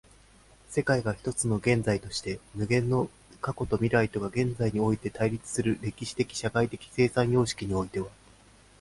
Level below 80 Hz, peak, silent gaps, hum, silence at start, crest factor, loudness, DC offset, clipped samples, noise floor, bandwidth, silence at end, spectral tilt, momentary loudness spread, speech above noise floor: -52 dBFS; -12 dBFS; none; none; 0.7 s; 18 dB; -29 LUFS; under 0.1%; under 0.1%; -57 dBFS; 11.5 kHz; 0.7 s; -5.5 dB/octave; 9 LU; 29 dB